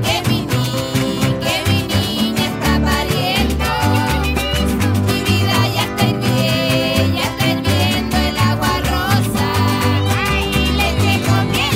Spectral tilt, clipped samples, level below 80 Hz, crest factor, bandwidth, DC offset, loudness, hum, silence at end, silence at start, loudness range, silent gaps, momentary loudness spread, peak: -5 dB/octave; under 0.1%; -28 dBFS; 14 dB; 16.5 kHz; under 0.1%; -16 LUFS; none; 0 s; 0 s; 1 LU; none; 2 LU; -2 dBFS